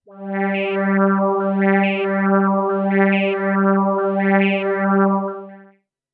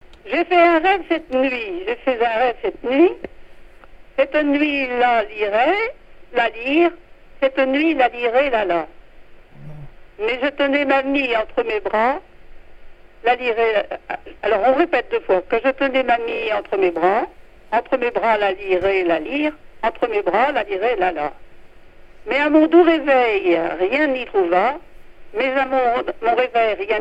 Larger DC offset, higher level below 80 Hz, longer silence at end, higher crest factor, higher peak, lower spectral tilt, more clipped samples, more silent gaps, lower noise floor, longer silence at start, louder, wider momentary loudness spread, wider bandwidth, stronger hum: second, under 0.1% vs 0.1%; second, -76 dBFS vs -46 dBFS; first, 0.5 s vs 0 s; about the same, 16 dB vs 18 dB; about the same, -2 dBFS vs -2 dBFS; first, -11 dB/octave vs -6 dB/octave; neither; neither; first, -54 dBFS vs -42 dBFS; about the same, 0.1 s vs 0.1 s; about the same, -18 LUFS vs -19 LUFS; second, 5 LU vs 9 LU; second, 3.9 kHz vs 8 kHz; neither